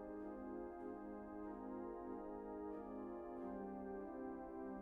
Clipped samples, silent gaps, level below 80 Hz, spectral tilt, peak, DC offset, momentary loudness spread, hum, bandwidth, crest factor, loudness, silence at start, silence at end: under 0.1%; none; -68 dBFS; -8.5 dB/octave; -38 dBFS; under 0.1%; 2 LU; none; 4 kHz; 12 dB; -51 LUFS; 0 s; 0 s